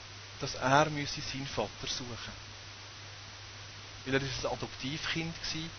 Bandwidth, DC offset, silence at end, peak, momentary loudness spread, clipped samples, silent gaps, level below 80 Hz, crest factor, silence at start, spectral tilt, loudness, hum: 6.6 kHz; under 0.1%; 0 s; -10 dBFS; 18 LU; under 0.1%; none; -56 dBFS; 26 dB; 0 s; -4 dB/octave; -34 LUFS; none